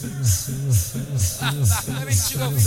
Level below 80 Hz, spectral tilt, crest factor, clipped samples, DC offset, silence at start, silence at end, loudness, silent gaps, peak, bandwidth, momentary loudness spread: -38 dBFS; -4 dB/octave; 14 dB; under 0.1%; under 0.1%; 0 s; 0 s; -22 LUFS; none; -6 dBFS; 17 kHz; 3 LU